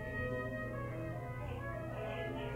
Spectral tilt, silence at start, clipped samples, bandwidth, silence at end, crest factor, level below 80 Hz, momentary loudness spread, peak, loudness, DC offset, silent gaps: -7.5 dB/octave; 0 s; under 0.1%; 16 kHz; 0 s; 14 dB; -54 dBFS; 4 LU; -28 dBFS; -42 LUFS; under 0.1%; none